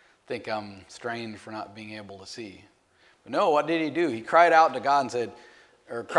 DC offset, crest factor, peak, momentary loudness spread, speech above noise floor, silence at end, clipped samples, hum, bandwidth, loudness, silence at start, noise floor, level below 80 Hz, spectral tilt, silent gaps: under 0.1%; 22 dB; -6 dBFS; 21 LU; 36 dB; 0 s; under 0.1%; none; 11.5 kHz; -24 LUFS; 0.3 s; -62 dBFS; -74 dBFS; -4.5 dB/octave; none